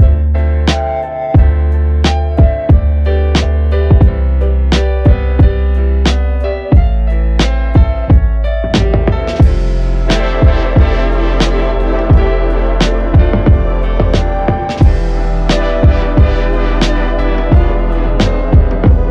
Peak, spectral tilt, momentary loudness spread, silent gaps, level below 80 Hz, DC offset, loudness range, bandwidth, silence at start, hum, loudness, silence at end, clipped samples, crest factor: 0 dBFS; -7 dB/octave; 4 LU; none; -12 dBFS; under 0.1%; 1 LU; 8 kHz; 0 s; none; -12 LUFS; 0 s; under 0.1%; 10 dB